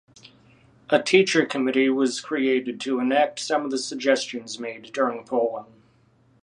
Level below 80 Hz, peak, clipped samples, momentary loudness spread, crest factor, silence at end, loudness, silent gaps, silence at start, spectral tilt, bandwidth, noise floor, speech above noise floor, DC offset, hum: -74 dBFS; -2 dBFS; under 0.1%; 13 LU; 22 dB; 0.8 s; -23 LUFS; none; 0.25 s; -3.5 dB/octave; 11 kHz; -60 dBFS; 37 dB; under 0.1%; none